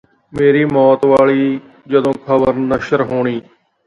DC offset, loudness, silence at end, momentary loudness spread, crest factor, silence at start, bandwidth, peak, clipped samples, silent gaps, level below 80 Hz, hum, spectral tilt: under 0.1%; -14 LUFS; 0.45 s; 9 LU; 14 dB; 0.35 s; 9.8 kHz; 0 dBFS; under 0.1%; none; -48 dBFS; none; -8 dB/octave